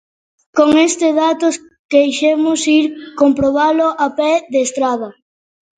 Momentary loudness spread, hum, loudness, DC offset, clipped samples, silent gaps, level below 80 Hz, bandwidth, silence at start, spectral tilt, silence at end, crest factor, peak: 7 LU; none; -14 LUFS; under 0.1%; under 0.1%; 1.79-1.89 s; -52 dBFS; 9.4 kHz; 0.55 s; -3.5 dB/octave; 0.65 s; 14 dB; 0 dBFS